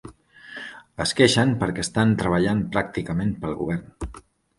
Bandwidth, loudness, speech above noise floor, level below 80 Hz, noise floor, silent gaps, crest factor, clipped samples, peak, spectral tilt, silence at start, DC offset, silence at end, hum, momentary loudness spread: 11.5 kHz; -22 LUFS; 22 dB; -44 dBFS; -45 dBFS; none; 22 dB; under 0.1%; -2 dBFS; -5 dB/octave; 0.05 s; under 0.1%; 0.4 s; none; 19 LU